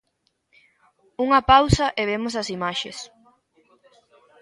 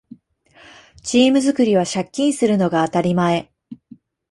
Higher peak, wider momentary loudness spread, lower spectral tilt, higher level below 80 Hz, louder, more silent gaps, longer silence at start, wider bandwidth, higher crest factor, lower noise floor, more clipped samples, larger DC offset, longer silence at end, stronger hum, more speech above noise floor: first, 0 dBFS vs -4 dBFS; first, 21 LU vs 8 LU; about the same, -5 dB/octave vs -5.5 dB/octave; first, -40 dBFS vs -58 dBFS; second, -21 LUFS vs -18 LUFS; neither; first, 1.2 s vs 1.05 s; about the same, 11.5 kHz vs 11.5 kHz; first, 24 dB vs 16 dB; first, -72 dBFS vs -52 dBFS; neither; neither; first, 1.35 s vs 0.55 s; neither; first, 52 dB vs 35 dB